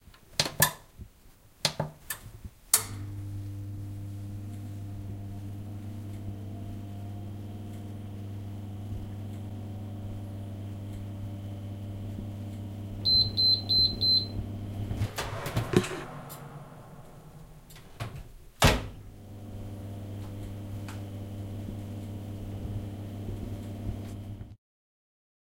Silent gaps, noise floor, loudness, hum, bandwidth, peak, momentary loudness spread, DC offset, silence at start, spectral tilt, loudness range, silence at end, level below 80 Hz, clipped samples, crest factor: none; -56 dBFS; -31 LUFS; none; 16 kHz; -2 dBFS; 22 LU; under 0.1%; 0.05 s; -3.5 dB/octave; 15 LU; 1 s; -46 dBFS; under 0.1%; 32 dB